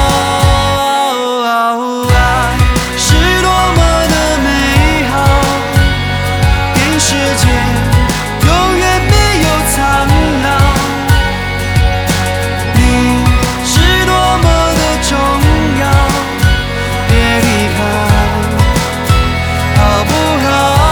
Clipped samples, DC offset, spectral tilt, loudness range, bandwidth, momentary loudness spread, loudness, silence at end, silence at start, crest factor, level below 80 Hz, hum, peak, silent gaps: under 0.1%; under 0.1%; -4.5 dB/octave; 1 LU; over 20 kHz; 4 LU; -11 LUFS; 0 s; 0 s; 10 dB; -16 dBFS; none; 0 dBFS; none